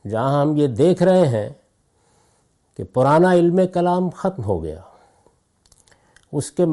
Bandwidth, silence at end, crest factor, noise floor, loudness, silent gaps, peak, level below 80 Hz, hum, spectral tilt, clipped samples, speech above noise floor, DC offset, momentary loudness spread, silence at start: 11.5 kHz; 0 s; 14 dB; -62 dBFS; -18 LUFS; none; -6 dBFS; -54 dBFS; none; -7.5 dB/octave; under 0.1%; 45 dB; under 0.1%; 14 LU; 0.05 s